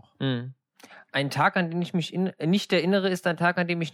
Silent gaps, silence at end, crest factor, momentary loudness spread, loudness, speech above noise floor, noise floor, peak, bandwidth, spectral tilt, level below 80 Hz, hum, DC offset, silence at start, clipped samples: none; 0.05 s; 18 dB; 6 LU; -26 LUFS; 27 dB; -52 dBFS; -8 dBFS; 14.5 kHz; -6 dB/octave; -76 dBFS; none; under 0.1%; 0.2 s; under 0.1%